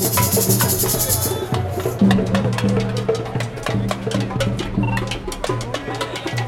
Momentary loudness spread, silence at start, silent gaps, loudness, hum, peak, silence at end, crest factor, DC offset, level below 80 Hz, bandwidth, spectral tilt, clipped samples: 9 LU; 0 s; none; -20 LUFS; none; -2 dBFS; 0 s; 16 dB; under 0.1%; -38 dBFS; 16.5 kHz; -4.5 dB/octave; under 0.1%